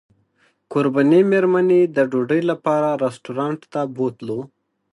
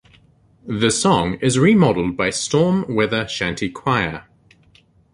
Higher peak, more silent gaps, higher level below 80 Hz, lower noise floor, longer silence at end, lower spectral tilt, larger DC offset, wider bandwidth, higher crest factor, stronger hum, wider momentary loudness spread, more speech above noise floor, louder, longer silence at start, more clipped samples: about the same, -4 dBFS vs -2 dBFS; neither; second, -70 dBFS vs -46 dBFS; first, -62 dBFS vs -54 dBFS; second, 0.45 s vs 0.9 s; first, -8 dB/octave vs -5 dB/octave; neither; about the same, 11 kHz vs 11.5 kHz; about the same, 16 dB vs 18 dB; neither; about the same, 11 LU vs 9 LU; first, 44 dB vs 36 dB; about the same, -19 LUFS vs -18 LUFS; about the same, 0.7 s vs 0.65 s; neither